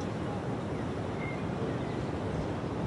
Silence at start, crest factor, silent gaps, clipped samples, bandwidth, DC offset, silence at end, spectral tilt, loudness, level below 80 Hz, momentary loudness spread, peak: 0 s; 12 dB; none; under 0.1%; 11.5 kHz; under 0.1%; 0 s; -7.5 dB/octave; -35 LUFS; -50 dBFS; 1 LU; -22 dBFS